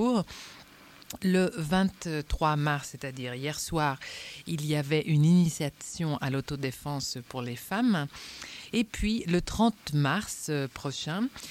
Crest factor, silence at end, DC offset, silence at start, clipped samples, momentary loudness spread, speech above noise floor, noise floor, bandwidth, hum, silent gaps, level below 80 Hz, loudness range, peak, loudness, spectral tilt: 16 dB; 0 s; under 0.1%; 0 s; under 0.1%; 12 LU; 24 dB; -53 dBFS; 16.5 kHz; none; none; -48 dBFS; 3 LU; -14 dBFS; -30 LUFS; -5.5 dB/octave